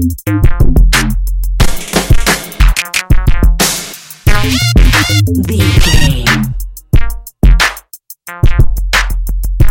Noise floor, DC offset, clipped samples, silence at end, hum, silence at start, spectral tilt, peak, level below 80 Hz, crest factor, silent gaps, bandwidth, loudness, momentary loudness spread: -34 dBFS; 2%; under 0.1%; 0 s; none; 0 s; -4 dB/octave; 0 dBFS; -12 dBFS; 8 dB; none; 17.5 kHz; -12 LUFS; 9 LU